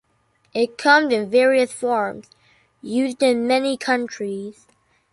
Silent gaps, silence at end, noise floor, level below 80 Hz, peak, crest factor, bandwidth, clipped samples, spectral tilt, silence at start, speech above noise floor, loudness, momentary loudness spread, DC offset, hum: none; 0.6 s; -64 dBFS; -68 dBFS; -2 dBFS; 18 dB; 11.5 kHz; under 0.1%; -3.5 dB/octave; 0.55 s; 44 dB; -20 LUFS; 14 LU; under 0.1%; none